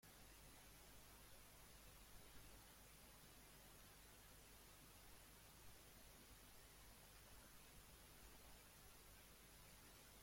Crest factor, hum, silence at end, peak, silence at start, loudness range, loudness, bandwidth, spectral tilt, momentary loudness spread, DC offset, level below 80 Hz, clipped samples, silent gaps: 14 dB; 50 Hz at -70 dBFS; 0 s; -50 dBFS; 0 s; 0 LU; -64 LUFS; 16.5 kHz; -2.5 dB/octave; 1 LU; under 0.1%; -72 dBFS; under 0.1%; none